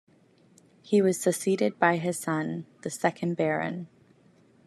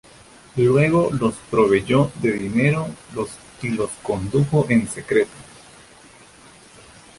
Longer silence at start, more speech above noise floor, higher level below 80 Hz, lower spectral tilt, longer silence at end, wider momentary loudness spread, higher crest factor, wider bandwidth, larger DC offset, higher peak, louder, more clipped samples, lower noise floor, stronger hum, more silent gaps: first, 0.85 s vs 0.55 s; first, 34 dB vs 28 dB; second, -76 dBFS vs -50 dBFS; about the same, -5.5 dB/octave vs -6.5 dB/octave; second, 0.8 s vs 1.75 s; about the same, 12 LU vs 13 LU; about the same, 22 dB vs 18 dB; first, 14 kHz vs 11.5 kHz; neither; about the same, -6 dBFS vs -4 dBFS; second, -27 LUFS vs -20 LUFS; neither; first, -61 dBFS vs -47 dBFS; neither; neither